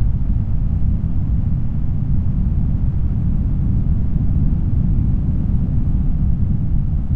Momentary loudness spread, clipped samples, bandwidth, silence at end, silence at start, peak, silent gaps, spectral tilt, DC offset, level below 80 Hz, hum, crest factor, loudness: 2 LU; under 0.1%; 2.8 kHz; 0 s; 0 s; -4 dBFS; none; -12 dB/octave; 3%; -20 dBFS; none; 12 dB; -20 LUFS